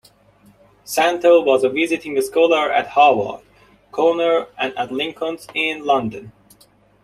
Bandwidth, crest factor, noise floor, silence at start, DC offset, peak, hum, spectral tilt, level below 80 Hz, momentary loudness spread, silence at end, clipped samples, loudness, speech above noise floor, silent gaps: 15 kHz; 18 dB; -54 dBFS; 0.85 s; under 0.1%; -2 dBFS; none; -4 dB/octave; -60 dBFS; 12 LU; 0.75 s; under 0.1%; -18 LUFS; 36 dB; none